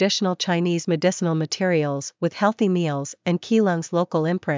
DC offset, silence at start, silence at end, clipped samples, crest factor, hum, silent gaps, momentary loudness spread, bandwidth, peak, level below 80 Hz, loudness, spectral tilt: under 0.1%; 0 s; 0 s; under 0.1%; 16 dB; none; none; 6 LU; 7.6 kHz; -6 dBFS; -74 dBFS; -22 LUFS; -5.5 dB/octave